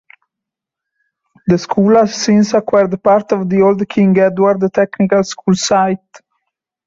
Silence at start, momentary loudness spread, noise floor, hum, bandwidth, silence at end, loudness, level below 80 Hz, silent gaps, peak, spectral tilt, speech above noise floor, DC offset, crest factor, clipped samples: 1.45 s; 5 LU; -82 dBFS; none; 7.8 kHz; 0.7 s; -13 LUFS; -52 dBFS; none; 0 dBFS; -6 dB/octave; 70 dB; under 0.1%; 14 dB; under 0.1%